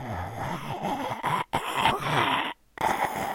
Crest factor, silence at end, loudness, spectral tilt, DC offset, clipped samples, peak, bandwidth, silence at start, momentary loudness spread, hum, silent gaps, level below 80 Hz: 22 dB; 0 s; -28 LUFS; -4 dB/octave; under 0.1%; under 0.1%; -6 dBFS; 16.5 kHz; 0 s; 9 LU; none; none; -54 dBFS